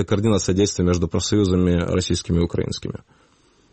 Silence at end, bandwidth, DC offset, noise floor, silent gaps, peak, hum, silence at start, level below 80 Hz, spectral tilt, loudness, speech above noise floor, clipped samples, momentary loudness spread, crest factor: 0.75 s; 8.8 kHz; under 0.1%; -57 dBFS; none; -6 dBFS; none; 0 s; -38 dBFS; -5.5 dB/octave; -20 LUFS; 37 dB; under 0.1%; 9 LU; 14 dB